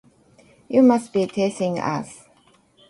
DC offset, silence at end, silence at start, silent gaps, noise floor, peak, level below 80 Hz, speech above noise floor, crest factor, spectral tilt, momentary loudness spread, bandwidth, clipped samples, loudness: under 0.1%; 0.75 s; 0.7 s; none; -57 dBFS; -6 dBFS; -64 dBFS; 38 dB; 18 dB; -6.5 dB/octave; 12 LU; 11.5 kHz; under 0.1%; -21 LUFS